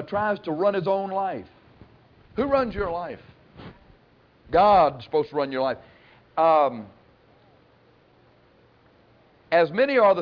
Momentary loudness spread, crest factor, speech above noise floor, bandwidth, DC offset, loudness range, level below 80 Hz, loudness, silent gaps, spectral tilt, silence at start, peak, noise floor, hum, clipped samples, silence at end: 18 LU; 16 dB; 36 dB; 5.4 kHz; under 0.1%; 7 LU; -52 dBFS; -23 LUFS; none; -8 dB/octave; 0 s; -8 dBFS; -58 dBFS; none; under 0.1%; 0 s